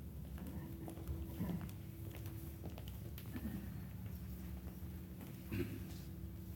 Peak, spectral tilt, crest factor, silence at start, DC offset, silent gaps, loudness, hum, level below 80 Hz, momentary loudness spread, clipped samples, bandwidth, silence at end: -30 dBFS; -7 dB/octave; 18 dB; 0 s; under 0.1%; none; -48 LUFS; none; -54 dBFS; 6 LU; under 0.1%; 17.5 kHz; 0 s